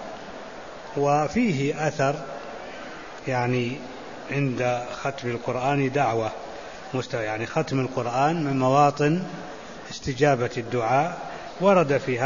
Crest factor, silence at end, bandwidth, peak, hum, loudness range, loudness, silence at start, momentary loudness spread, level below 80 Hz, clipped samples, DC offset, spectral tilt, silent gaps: 18 dB; 0 s; 7.4 kHz; -6 dBFS; none; 4 LU; -24 LUFS; 0 s; 17 LU; -56 dBFS; under 0.1%; 0.4%; -6 dB/octave; none